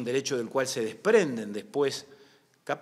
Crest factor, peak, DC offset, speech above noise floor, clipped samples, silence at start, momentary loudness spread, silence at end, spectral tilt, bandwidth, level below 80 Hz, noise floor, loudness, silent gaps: 20 dB; -8 dBFS; under 0.1%; 32 dB; under 0.1%; 0 s; 12 LU; 0 s; -4 dB/octave; 14.5 kHz; -80 dBFS; -60 dBFS; -28 LUFS; none